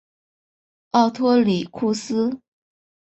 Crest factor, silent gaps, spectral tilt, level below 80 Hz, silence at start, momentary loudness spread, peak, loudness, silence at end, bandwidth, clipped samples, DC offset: 20 dB; none; -6 dB/octave; -64 dBFS; 0.95 s; 7 LU; -4 dBFS; -21 LUFS; 0.7 s; 8.2 kHz; under 0.1%; under 0.1%